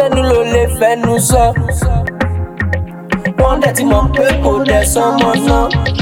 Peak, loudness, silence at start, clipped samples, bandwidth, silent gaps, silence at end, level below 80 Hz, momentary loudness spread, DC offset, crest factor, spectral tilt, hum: 0 dBFS; -12 LUFS; 0 s; under 0.1%; 17.5 kHz; none; 0 s; -20 dBFS; 7 LU; under 0.1%; 12 dB; -5 dB/octave; none